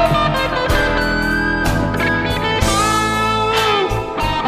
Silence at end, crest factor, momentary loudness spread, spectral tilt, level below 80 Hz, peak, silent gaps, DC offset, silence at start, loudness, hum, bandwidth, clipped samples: 0 s; 14 dB; 3 LU; -4.5 dB/octave; -26 dBFS; -2 dBFS; none; under 0.1%; 0 s; -16 LUFS; none; 15.5 kHz; under 0.1%